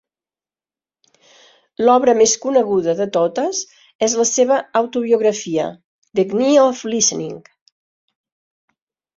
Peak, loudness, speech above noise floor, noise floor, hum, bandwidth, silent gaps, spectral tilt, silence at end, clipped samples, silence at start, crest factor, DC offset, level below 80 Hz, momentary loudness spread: -2 dBFS; -17 LUFS; over 74 dB; under -90 dBFS; none; 7.8 kHz; 3.95-3.99 s, 5.84-6.02 s; -3 dB/octave; 1.75 s; under 0.1%; 1.8 s; 16 dB; under 0.1%; -64 dBFS; 12 LU